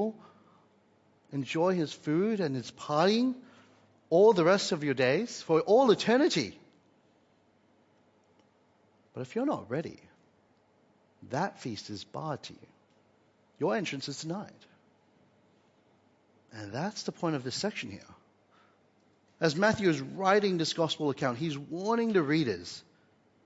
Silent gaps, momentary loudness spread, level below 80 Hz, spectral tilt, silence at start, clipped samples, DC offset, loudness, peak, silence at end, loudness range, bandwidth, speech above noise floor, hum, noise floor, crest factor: none; 16 LU; -74 dBFS; -5 dB/octave; 0 s; under 0.1%; under 0.1%; -29 LUFS; -10 dBFS; 0.65 s; 14 LU; 8 kHz; 38 dB; none; -67 dBFS; 20 dB